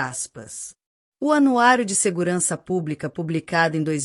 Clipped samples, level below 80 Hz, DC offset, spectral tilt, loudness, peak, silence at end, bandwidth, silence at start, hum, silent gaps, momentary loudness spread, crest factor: under 0.1%; -64 dBFS; under 0.1%; -4 dB/octave; -21 LUFS; -4 dBFS; 0 s; 13.5 kHz; 0 s; none; 0.86-1.12 s; 16 LU; 18 dB